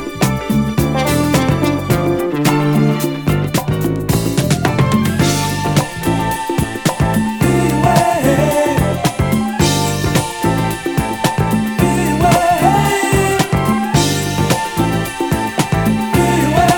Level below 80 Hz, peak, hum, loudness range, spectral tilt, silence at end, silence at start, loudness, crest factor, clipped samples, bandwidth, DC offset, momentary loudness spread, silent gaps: -32 dBFS; 0 dBFS; none; 2 LU; -5.5 dB/octave; 0 s; 0 s; -15 LUFS; 14 dB; under 0.1%; 19.5 kHz; under 0.1%; 5 LU; none